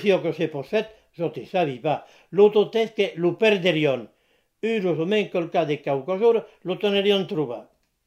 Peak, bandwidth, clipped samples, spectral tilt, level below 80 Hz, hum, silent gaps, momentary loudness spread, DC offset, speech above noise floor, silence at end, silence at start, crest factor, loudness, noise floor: -4 dBFS; 11.5 kHz; under 0.1%; -6.5 dB/octave; -70 dBFS; none; none; 11 LU; under 0.1%; 44 dB; 0.45 s; 0 s; 18 dB; -23 LUFS; -66 dBFS